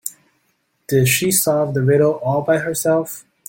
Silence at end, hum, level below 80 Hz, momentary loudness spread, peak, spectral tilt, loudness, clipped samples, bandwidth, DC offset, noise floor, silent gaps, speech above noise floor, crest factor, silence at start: 0.3 s; none; -54 dBFS; 6 LU; -2 dBFS; -4.5 dB/octave; -17 LUFS; under 0.1%; 17 kHz; under 0.1%; -66 dBFS; none; 49 dB; 16 dB; 0.05 s